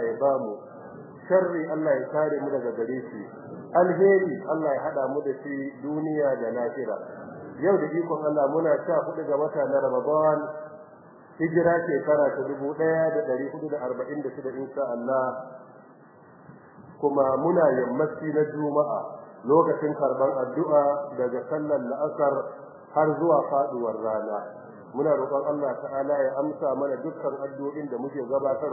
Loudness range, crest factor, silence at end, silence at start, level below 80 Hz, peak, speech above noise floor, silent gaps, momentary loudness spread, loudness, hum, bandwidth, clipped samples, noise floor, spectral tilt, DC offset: 4 LU; 18 dB; 0 s; 0 s; -72 dBFS; -8 dBFS; 26 dB; none; 12 LU; -26 LUFS; none; 2.1 kHz; under 0.1%; -51 dBFS; -13.5 dB/octave; under 0.1%